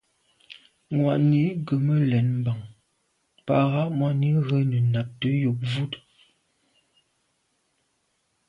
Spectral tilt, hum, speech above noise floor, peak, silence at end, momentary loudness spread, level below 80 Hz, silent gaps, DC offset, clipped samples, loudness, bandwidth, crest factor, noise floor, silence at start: -9 dB/octave; none; 50 dB; -8 dBFS; 2.5 s; 9 LU; -62 dBFS; none; under 0.1%; under 0.1%; -24 LUFS; 5.6 kHz; 18 dB; -72 dBFS; 0.5 s